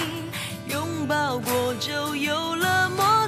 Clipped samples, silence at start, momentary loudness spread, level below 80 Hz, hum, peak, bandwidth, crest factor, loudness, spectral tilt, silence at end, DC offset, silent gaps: under 0.1%; 0 s; 9 LU; -60 dBFS; none; -8 dBFS; 15.5 kHz; 16 dB; -25 LUFS; -3.5 dB/octave; 0 s; under 0.1%; none